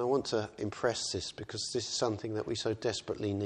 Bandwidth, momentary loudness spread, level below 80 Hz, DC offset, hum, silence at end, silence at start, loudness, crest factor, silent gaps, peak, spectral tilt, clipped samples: 11 kHz; 6 LU; -64 dBFS; under 0.1%; none; 0 s; 0 s; -34 LUFS; 18 dB; none; -16 dBFS; -4 dB/octave; under 0.1%